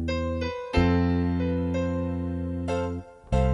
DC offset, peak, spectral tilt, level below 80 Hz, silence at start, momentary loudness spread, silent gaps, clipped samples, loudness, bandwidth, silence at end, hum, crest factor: under 0.1%; -10 dBFS; -8 dB/octave; -34 dBFS; 0 s; 8 LU; none; under 0.1%; -27 LUFS; 9.6 kHz; 0 s; none; 16 dB